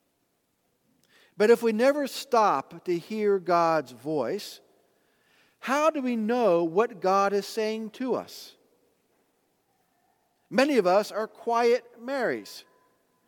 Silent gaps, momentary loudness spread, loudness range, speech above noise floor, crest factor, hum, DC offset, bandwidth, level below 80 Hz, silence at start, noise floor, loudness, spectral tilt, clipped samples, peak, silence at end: none; 11 LU; 5 LU; 48 dB; 20 dB; none; under 0.1%; 19 kHz; -84 dBFS; 1.4 s; -73 dBFS; -26 LUFS; -5 dB/octave; under 0.1%; -6 dBFS; 0.7 s